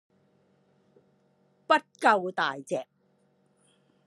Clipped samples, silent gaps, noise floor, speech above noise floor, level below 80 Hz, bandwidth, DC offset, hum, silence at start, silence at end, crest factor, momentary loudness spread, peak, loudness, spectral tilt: under 0.1%; none; -68 dBFS; 42 dB; -88 dBFS; 12.5 kHz; under 0.1%; none; 1.7 s; 1.25 s; 24 dB; 12 LU; -8 dBFS; -27 LUFS; -4 dB/octave